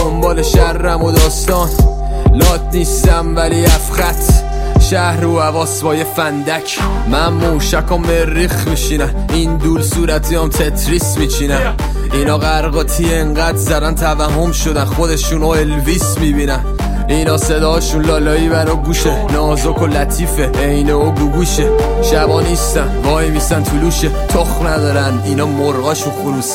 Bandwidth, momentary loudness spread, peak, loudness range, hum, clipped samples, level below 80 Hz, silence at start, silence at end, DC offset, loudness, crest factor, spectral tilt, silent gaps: 16.5 kHz; 4 LU; 0 dBFS; 2 LU; none; under 0.1%; -16 dBFS; 0 s; 0 s; under 0.1%; -14 LUFS; 12 dB; -5 dB/octave; none